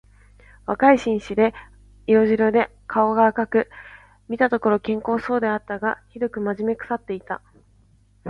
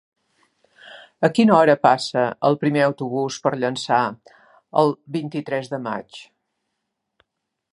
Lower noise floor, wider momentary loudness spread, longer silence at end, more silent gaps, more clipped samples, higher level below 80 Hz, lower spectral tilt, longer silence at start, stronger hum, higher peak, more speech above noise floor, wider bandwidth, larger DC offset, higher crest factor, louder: second, -56 dBFS vs -79 dBFS; about the same, 14 LU vs 13 LU; second, 0 s vs 1.5 s; neither; neither; first, -52 dBFS vs -70 dBFS; about the same, -7 dB/octave vs -6 dB/octave; second, 0.7 s vs 0.85 s; first, 50 Hz at -50 dBFS vs none; about the same, -2 dBFS vs -2 dBFS; second, 36 dB vs 60 dB; second, 7.4 kHz vs 11.5 kHz; neither; about the same, 20 dB vs 20 dB; about the same, -21 LUFS vs -20 LUFS